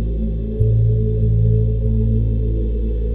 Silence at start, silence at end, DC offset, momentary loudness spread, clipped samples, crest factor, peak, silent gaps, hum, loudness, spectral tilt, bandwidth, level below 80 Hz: 0 s; 0 s; under 0.1%; 6 LU; under 0.1%; 14 dB; -4 dBFS; none; none; -19 LUFS; -13 dB/octave; 0.9 kHz; -20 dBFS